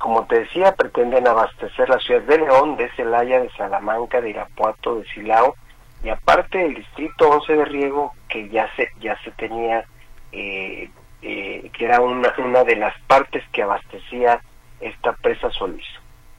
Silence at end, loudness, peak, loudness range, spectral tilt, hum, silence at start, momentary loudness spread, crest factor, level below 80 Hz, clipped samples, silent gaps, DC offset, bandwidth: 0.4 s; -19 LUFS; -2 dBFS; 7 LU; -5 dB/octave; none; 0 s; 14 LU; 18 dB; -42 dBFS; under 0.1%; none; under 0.1%; 11 kHz